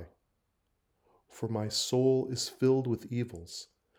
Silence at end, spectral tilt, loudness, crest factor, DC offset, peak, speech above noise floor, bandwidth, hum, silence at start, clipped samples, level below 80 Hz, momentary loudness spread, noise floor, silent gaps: 0.35 s; -5.5 dB/octave; -31 LUFS; 18 dB; under 0.1%; -16 dBFS; 47 dB; 16 kHz; none; 0 s; under 0.1%; -68 dBFS; 15 LU; -78 dBFS; none